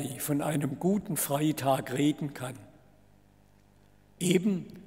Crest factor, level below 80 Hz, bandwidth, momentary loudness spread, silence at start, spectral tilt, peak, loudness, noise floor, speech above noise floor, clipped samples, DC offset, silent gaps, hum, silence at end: 22 dB; -66 dBFS; 16 kHz; 10 LU; 0 s; -5.5 dB/octave; -10 dBFS; -30 LUFS; -62 dBFS; 32 dB; under 0.1%; under 0.1%; none; 50 Hz at -55 dBFS; 0.05 s